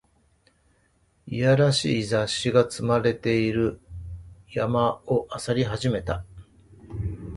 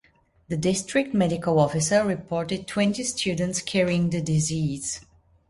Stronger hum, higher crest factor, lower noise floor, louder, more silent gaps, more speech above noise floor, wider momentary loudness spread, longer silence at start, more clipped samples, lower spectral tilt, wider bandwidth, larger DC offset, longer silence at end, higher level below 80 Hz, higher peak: neither; about the same, 20 dB vs 18 dB; first, -65 dBFS vs -59 dBFS; about the same, -24 LUFS vs -24 LUFS; neither; first, 41 dB vs 35 dB; first, 16 LU vs 6 LU; first, 1.25 s vs 0.5 s; neither; about the same, -5.5 dB/octave vs -5 dB/octave; about the same, 11.5 kHz vs 11.5 kHz; neither; second, 0 s vs 0.5 s; first, -46 dBFS vs -54 dBFS; about the same, -6 dBFS vs -8 dBFS